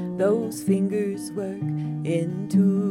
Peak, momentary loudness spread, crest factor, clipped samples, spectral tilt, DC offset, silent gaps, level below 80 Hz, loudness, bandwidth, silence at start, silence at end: -10 dBFS; 8 LU; 14 dB; under 0.1%; -8 dB/octave; under 0.1%; none; -66 dBFS; -25 LUFS; 14.5 kHz; 0 s; 0 s